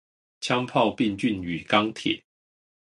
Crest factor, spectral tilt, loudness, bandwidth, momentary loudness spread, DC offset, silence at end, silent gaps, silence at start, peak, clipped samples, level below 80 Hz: 22 dB; -5 dB/octave; -25 LUFS; 11.5 kHz; 8 LU; under 0.1%; 0.65 s; none; 0.4 s; -4 dBFS; under 0.1%; -58 dBFS